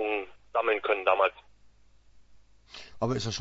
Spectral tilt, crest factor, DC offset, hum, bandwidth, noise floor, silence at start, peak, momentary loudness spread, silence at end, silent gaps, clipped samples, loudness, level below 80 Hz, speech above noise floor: -4.5 dB/octave; 20 dB; under 0.1%; none; 8 kHz; -57 dBFS; 0 s; -10 dBFS; 22 LU; 0 s; none; under 0.1%; -28 LUFS; -60 dBFS; 29 dB